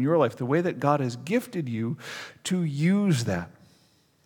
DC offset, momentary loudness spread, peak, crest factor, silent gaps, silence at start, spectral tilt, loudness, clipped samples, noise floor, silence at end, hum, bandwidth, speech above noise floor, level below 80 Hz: under 0.1%; 11 LU; -8 dBFS; 18 dB; none; 0 s; -6.5 dB/octave; -26 LUFS; under 0.1%; -63 dBFS; 0.75 s; none; 18.5 kHz; 37 dB; -64 dBFS